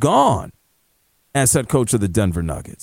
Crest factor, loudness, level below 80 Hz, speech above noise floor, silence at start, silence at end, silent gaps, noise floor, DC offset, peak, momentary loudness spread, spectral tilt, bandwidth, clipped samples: 16 dB; -18 LUFS; -38 dBFS; 46 dB; 0 s; 0.1 s; none; -63 dBFS; under 0.1%; -2 dBFS; 10 LU; -5 dB/octave; 16.5 kHz; under 0.1%